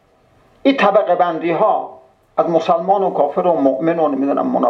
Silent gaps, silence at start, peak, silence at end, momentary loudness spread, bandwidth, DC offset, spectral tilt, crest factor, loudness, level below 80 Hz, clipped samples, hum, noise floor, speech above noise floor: none; 0.65 s; 0 dBFS; 0 s; 6 LU; 7 kHz; under 0.1%; -7.5 dB/octave; 16 dB; -16 LUFS; -66 dBFS; under 0.1%; none; -53 dBFS; 38 dB